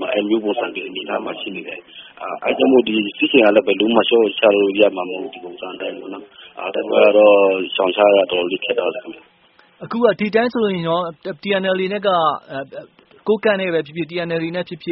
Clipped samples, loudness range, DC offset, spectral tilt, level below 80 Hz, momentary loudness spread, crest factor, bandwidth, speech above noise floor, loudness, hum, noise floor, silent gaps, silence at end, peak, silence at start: under 0.1%; 5 LU; under 0.1%; -3 dB/octave; -64 dBFS; 17 LU; 18 dB; 5.6 kHz; 36 dB; -17 LUFS; none; -53 dBFS; none; 0 s; 0 dBFS; 0 s